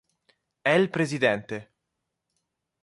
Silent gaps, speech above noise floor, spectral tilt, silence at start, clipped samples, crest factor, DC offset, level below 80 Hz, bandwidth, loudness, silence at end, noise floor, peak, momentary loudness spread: none; 58 dB; -5.5 dB/octave; 0.65 s; under 0.1%; 20 dB; under 0.1%; -68 dBFS; 11.5 kHz; -25 LUFS; 1.2 s; -82 dBFS; -8 dBFS; 14 LU